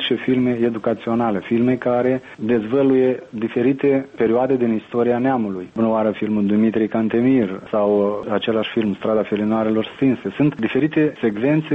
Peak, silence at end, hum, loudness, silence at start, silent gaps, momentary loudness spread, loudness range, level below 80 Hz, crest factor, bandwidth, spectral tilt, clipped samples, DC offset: -6 dBFS; 0 s; none; -19 LUFS; 0 s; none; 4 LU; 1 LU; -58 dBFS; 12 dB; 5.6 kHz; -9 dB/octave; under 0.1%; under 0.1%